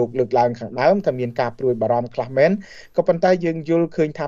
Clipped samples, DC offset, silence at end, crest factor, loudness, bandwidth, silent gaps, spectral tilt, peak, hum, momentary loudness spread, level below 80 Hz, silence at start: under 0.1%; under 0.1%; 0 s; 14 dB; -20 LUFS; 7.4 kHz; none; -7.5 dB/octave; -4 dBFS; none; 6 LU; -56 dBFS; 0 s